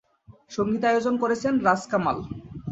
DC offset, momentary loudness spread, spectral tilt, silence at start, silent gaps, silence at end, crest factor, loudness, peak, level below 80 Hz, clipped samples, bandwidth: under 0.1%; 13 LU; -6 dB/octave; 0.3 s; none; 0 s; 20 dB; -24 LUFS; -6 dBFS; -54 dBFS; under 0.1%; 8.2 kHz